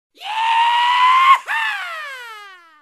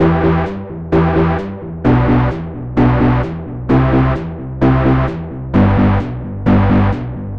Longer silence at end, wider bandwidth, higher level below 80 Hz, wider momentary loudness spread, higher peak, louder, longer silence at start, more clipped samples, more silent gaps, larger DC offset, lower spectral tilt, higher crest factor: first, 0.25 s vs 0 s; first, 15 kHz vs 5.6 kHz; second, -84 dBFS vs -26 dBFS; first, 18 LU vs 11 LU; about the same, 0 dBFS vs -2 dBFS; about the same, -15 LUFS vs -15 LUFS; first, 0.2 s vs 0 s; neither; neither; second, under 0.1% vs 1%; second, 3.5 dB/octave vs -10 dB/octave; about the same, 16 dB vs 12 dB